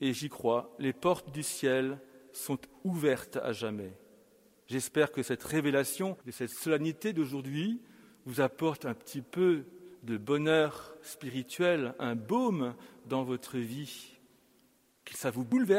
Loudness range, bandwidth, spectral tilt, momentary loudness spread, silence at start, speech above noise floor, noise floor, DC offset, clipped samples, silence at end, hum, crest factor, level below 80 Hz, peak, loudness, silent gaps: 4 LU; 16 kHz; -5 dB/octave; 14 LU; 0 s; 36 dB; -68 dBFS; under 0.1%; under 0.1%; 0 s; none; 18 dB; -72 dBFS; -14 dBFS; -33 LUFS; none